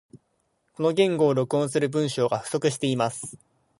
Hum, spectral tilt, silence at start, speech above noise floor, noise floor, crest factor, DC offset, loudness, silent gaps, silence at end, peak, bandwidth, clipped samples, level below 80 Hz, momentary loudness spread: none; -5.5 dB/octave; 0.15 s; 48 dB; -72 dBFS; 18 dB; under 0.1%; -24 LUFS; none; 0.45 s; -6 dBFS; 11.5 kHz; under 0.1%; -68 dBFS; 6 LU